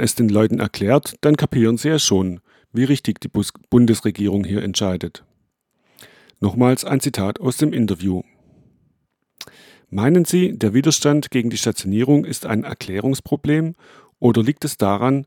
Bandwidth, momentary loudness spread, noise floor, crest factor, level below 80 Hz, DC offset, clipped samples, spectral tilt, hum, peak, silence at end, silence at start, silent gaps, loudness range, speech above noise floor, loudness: 19 kHz; 9 LU; -69 dBFS; 18 dB; -52 dBFS; under 0.1%; under 0.1%; -5.5 dB/octave; none; -2 dBFS; 0 s; 0 s; none; 4 LU; 51 dB; -19 LUFS